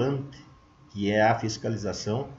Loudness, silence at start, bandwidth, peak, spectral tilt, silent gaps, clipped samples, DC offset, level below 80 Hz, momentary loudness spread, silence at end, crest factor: -27 LUFS; 0 s; 8 kHz; -10 dBFS; -5.5 dB/octave; none; under 0.1%; under 0.1%; -56 dBFS; 15 LU; 0 s; 18 dB